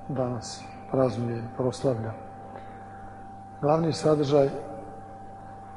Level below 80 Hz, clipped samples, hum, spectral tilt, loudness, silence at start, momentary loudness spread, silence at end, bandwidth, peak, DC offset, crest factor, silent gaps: -54 dBFS; under 0.1%; none; -7 dB/octave; -27 LUFS; 0 s; 20 LU; 0 s; 11.5 kHz; -10 dBFS; under 0.1%; 20 dB; none